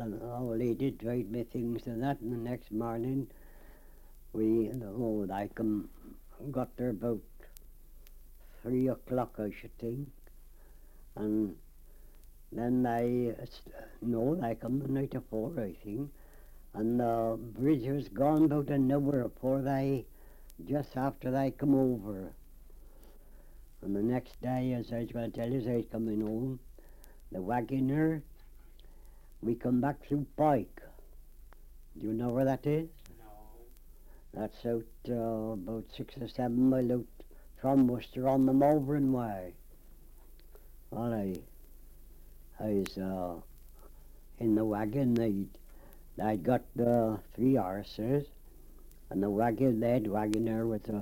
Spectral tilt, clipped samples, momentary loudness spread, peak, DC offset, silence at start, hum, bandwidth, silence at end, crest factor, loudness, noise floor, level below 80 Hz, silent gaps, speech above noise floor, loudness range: -8.5 dB/octave; under 0.1%; 13 LU; -14 dBFS; under 0.1%; 0 s; none; 17 kHz; 0 s; 20 dB; -33 LUFS; -53 dBFS; -52 dBFS; none; 21 dB; 8 LU